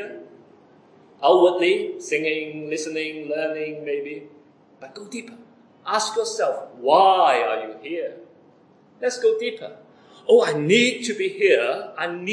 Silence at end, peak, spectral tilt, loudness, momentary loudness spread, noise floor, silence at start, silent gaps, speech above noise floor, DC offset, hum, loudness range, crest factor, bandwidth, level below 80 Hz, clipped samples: 0 s; -4 dBFS; -3.5 dB/octave; -21 LUFS; 19 LU; -54 dBFS; 0 s; none; 33 dB; under 0.1%; none; 8 LU; 20 dB; 10.5 kHz; -86 dBFS; under 0.1%